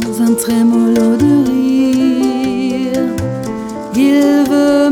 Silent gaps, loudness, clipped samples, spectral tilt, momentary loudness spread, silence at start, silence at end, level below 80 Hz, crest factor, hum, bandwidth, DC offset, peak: none; -13 LUFS; under 0.1%; -5.5 dB/octave; 9 LU; 0 s; 0 s; -44 dBFS; 10 dB; none; 16.5 kHz; under 0.1%; 0 dBFS